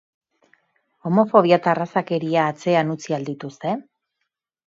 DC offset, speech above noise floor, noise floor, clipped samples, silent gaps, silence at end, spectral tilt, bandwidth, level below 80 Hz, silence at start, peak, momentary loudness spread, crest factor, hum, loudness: under 0.1%; 59 dB; -78 dBFS; under 0.1%; none; 0.85 s; -7 dB/octave; 7.8 kHz; -70 dBFS; 1.05 s; 0 dBFS; 13 LU; 22 dB; none; -20 LUFS